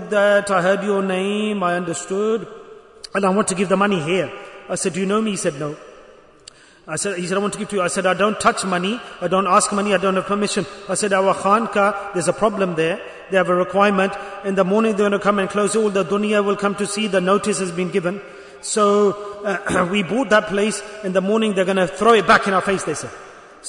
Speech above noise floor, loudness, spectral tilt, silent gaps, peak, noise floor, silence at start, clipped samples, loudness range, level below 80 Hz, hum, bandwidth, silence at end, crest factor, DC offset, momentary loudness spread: 27 dB; -19 LUFS; -4.5 dB/octave; none; -2 dBFS; -46 dBFS; 0 s; under 0.1%; 4 LU; -56 dBFS; none; 11 kHz; 0 s; 18 dB; under 0.1%; 10 LU